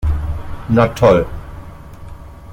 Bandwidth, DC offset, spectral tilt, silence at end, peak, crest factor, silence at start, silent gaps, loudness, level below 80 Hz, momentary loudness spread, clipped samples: 16.5 kHz; under 0.1%; -7.5 dB/octave; 0 s; -2 dBFS; 16 dB; 0 s; none; -16 LUFS; -28 dBFS; 25 LU; under 0.1%